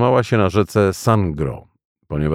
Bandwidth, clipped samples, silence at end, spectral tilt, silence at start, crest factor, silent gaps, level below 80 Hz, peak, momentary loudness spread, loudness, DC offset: 15.5 kHz; under 0.1%; 0 s; -7 dB/octave; 0 s; 16 dB; 1.85-1.95 s; -38 dBFS; -2 dBFS; 11 LU; -18 LUFS; under 0.1%